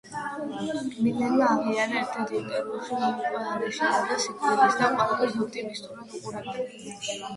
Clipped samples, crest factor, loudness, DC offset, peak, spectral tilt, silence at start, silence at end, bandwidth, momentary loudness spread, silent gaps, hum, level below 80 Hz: under 0.1%; 20 dB; -27 LUFS; under 0.1%; -8 dBFS; -4 dB/octave; 0.05 s; 0 s; 11.5 kHz; 13 LU; none; none; -68 dBFS